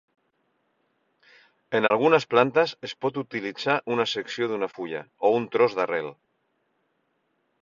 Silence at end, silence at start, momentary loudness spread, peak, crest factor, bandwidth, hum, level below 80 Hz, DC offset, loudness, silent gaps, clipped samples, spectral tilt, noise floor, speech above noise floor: 1.5 s; 1.7 s; 11 LU; -4 dBFS; 24 dB; 7.4 kHz; none; -70 dBFS; under 0.1%; -25 LUFS; none; under 0.1%; -5.5 dB/octave; -73 dBFS; 49 dB